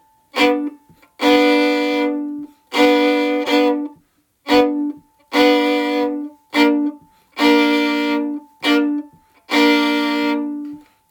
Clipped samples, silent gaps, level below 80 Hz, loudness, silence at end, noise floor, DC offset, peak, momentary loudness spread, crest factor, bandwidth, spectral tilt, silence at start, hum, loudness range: under 0.1%; none; -60 dBFS; -17 LUFS; 0.3 s; -58 dBFS; under 0.1%; -2 dBFS; 13 LU; 16 dB; 18 kHz; -3 dB/octave; 0.35 s; none; 1 LU